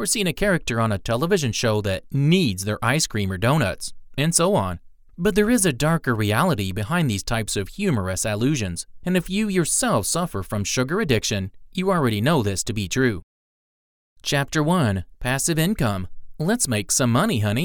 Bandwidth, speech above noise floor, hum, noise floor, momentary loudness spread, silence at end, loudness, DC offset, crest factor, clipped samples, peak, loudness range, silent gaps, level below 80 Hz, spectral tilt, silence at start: over 20 kHz; over 69 dB; none; under -90 dBFS; 7 LU; 0 s; -22 LUFS; under 0.1%; 18 dB; under 0.1%; -4 dBFS; 2 LU; 13.23-14.16 s; -42 dBFS; -4.5 dB/octave; 0 s